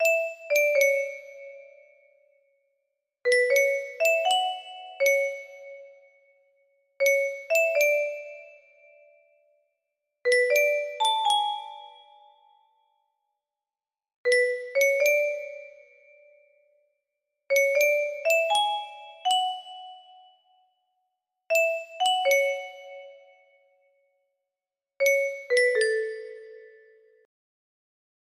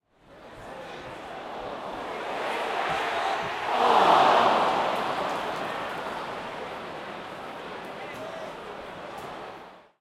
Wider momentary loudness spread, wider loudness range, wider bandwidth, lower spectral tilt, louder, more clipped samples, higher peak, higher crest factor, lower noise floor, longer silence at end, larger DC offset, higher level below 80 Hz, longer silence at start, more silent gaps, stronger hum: first, 22 LU vs 19 LU; second, 4 LU vs 14 LU; about the same, 15 kHz vs 15.5 kHz; second, 2.5 dB/octave vs -3.5 dB/octave; first, -24 LUFS vs -27 LUFS; neither; about the same, -10 dBFS vs -8 dBFS; about the same, 18 dB vs 20 dB; first, under -90 dBFS vs -51 dBFS; first, 1.55 s vs 0.2 s; neither; second, -80 dBFS vs -62 dBFS; second, 0 s vs 0.3 s; first, 14.16-14.24 s vs none; neither